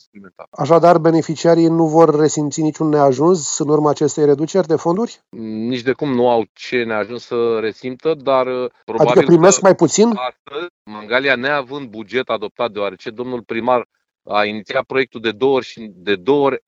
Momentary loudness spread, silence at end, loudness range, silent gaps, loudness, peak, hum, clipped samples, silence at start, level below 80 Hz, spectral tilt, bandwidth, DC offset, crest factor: 14 LU; 0.1 s; 7 LU; 0.47-0.52 s, 6.49-6.55 s, 8.83-8.87 s, 10.39-10.45 s, 10.70-10.85 s, 12.51-12.55 s, 13.85-13.90 s; -16 LUFS; 0 dBFS; none; under 0.1%; 0.15 s; -62 dBFS; -5 dB/octave; 7.8 kHz; under 0.1%; 16 dB